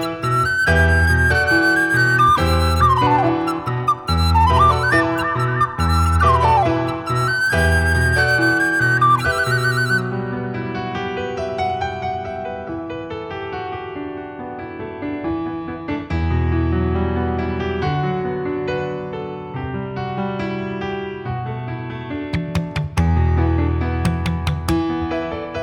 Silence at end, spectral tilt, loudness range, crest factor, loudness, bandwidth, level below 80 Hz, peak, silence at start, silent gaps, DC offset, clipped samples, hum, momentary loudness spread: 0 s; -6 dB/octave; 10 LU; 16 dB; -19 LUFS; 17 kHz; -30 dBFS; -2 dBFS; 0 s; none; under 0.1%; under 0.1%; none; 13 LU